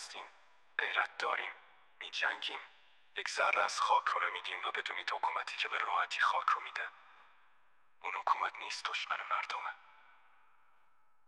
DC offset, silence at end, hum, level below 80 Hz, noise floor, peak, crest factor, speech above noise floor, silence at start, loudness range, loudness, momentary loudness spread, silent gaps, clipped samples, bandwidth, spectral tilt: under 0.1%; 1.5 s; none; -86 dBFS; -74 dBFS; -16 dBFS; 22 dB; 38 dB; 0 s; 5 LU; -35 LUFS; 14 LU; none; under 0.1%; 12.5 kHz; 1.5 dB/octave